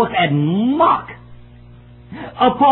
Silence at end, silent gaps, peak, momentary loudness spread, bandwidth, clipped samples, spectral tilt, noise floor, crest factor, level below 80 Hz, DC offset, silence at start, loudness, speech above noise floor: 0 s; none; -2 dBFS; 20 LU; 4.2 kHz; under 0.1%; -10.5 dB/octave; -41 dBFS; 16 dB; -48 dBFS; under 0.1%; 0 s; -16 LUFS; 26 dB